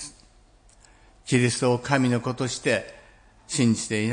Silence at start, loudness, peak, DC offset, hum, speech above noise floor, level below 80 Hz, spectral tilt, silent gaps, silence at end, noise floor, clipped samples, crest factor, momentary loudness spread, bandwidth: 0 s; -24 LUFS; -4 dBFS; under 0.1%; none; 32 dB; -56 dBFS; -5 dB/octave; none; 0 s; -56 dBFS; under 0.1%; 20 dB; 12 LU; 10.5 kHz